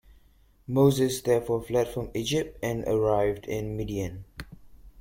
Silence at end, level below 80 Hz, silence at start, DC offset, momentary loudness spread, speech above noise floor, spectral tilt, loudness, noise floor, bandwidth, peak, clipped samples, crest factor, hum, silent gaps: 0.1 s; -48 dBFS; 0.7 s; under 0.1%; 14 LU; 33 dB; -6 dB/octave; -27 LUFS; -59 dBFS; 16.5 kHz; -10 dBFS; under 0.1%; 18 dB; none; none